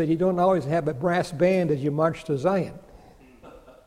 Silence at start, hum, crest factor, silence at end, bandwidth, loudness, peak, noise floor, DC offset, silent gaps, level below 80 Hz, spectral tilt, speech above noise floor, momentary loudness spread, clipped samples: 0 s; none; 16 dB; 0.15 s; 14 kHz; -24 LUFS; -8 dBFS; -50 dBFS; under 0.1%; none; -54 dBFS; -7.5 dB/octave; 27 dB; 5 LU; under 0.1%